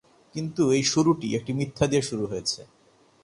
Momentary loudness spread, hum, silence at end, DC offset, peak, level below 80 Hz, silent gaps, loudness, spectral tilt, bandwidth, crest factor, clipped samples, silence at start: 12 LU; none; 0.6 s; under 0.1%; -6 dBFS; -56 dBFS; none; -25 LUFS; -5 dB/octave; 11.5 kHz; 20 dB; under 0.1%; 0.35 s